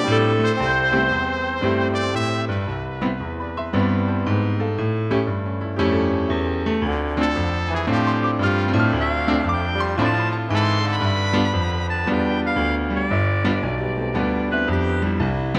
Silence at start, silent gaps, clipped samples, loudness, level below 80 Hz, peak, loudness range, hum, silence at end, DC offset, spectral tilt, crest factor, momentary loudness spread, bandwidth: 0 s; none; under 0.1%; -21 LUFS; -36 dBFS; -6 dBFS; 2 LU; none; 0 s; under 0.1%; -7 dB/octave; 16 dB; 5 LU; 9.4 kHz